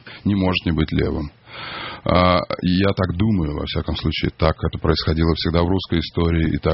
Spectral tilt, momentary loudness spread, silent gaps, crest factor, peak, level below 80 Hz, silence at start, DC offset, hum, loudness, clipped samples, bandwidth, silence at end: -5.5 dB/octave; 8 LU; none; 18 dB; 0 dBFS; -32 dBFS; 0.05 s; under 0.1%; none; -20 LUFS; under 0.1%; 5.8 kHz; 0 s